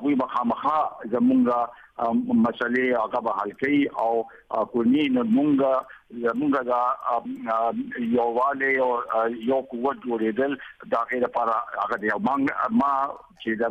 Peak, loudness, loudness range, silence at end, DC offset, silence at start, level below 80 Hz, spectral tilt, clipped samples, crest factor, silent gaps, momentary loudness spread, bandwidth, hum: -12 dBFS; -24 LUFS; 2 LU; 0 s; under 0.1%; 0 s; -64 dBFS; -7.5 dB/octave; under 0.1%; 12 dB; none; 7 LU; 5.6 kHz; none